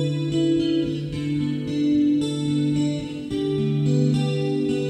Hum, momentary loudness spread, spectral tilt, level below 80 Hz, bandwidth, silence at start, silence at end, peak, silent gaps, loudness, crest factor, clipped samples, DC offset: none; 6 LU; -7.5 dB/octave; -50 dBFS; 10.5 kHz; 0 s; 0 s; -8 dBFS; none; -23 LUFS; 14 dB; under 0.1%; under 0.1%